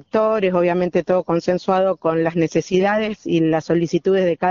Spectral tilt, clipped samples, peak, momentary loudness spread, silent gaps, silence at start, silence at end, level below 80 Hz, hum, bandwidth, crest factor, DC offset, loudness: -6 dB/octave; under 0.1%; -4 dBFS; 2 LU; none; 0.15 s; 0 s; -54 dBFS; none; 7.4 kHz; 14 dB; under 0.1%; -19 LUFS